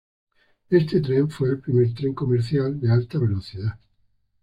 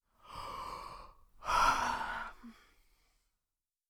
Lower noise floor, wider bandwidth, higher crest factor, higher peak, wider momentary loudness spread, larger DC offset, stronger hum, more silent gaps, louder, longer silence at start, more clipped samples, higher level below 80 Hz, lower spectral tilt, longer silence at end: second, -65 dBFS vs under -90 dBFS; second, 8.8 kHz vs over 20 kHz; second, 16 dB vs 22 dB; first, -6 dBFS vs -16 dBFS; second, 7 LU vs 22 LU; neither; neither; neither; first, -23 LUFS vs -35 LUFS; first, 0.7 s vs 0.25 s; neither; about the same, -54 dBFS vs -54 dBFS; first, -9.5 dB/octave vs -2 dB/octave; second, 0.65 s vs 1.4 s